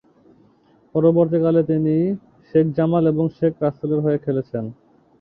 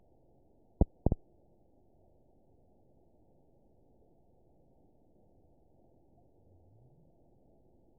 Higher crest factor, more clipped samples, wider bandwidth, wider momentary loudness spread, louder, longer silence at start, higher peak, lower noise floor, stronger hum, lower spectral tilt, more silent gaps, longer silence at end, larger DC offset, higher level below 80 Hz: second, 16 dB vs 34 dB; neither; first, 4.3 kHz vs 1 kHz; second, 9 LU vs 32 LU; first, -20 LUFS vs -35 LUFS; first, 0.95 s vs 0.8 s; first, -4 dBFS vs -10 dBFS; second, -56 dBFS vs -67 dBFS; neither; first, -12.5 dB/octave vs -6 dB/octave; neither; second, 0.5 s vs 6.85 s; neither; second, -58 dBFS vs -46 dBFS